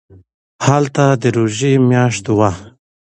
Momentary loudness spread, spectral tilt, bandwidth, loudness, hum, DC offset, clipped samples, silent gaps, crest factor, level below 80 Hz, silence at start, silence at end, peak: 5 LU; -6 dB/octave; 9.8 kHz; -14 LUFS; none; under 0.1%; under 0.1%; none; 14 dB; -46 dBFS; 0.6 s; 0.4 s; 0 dBFS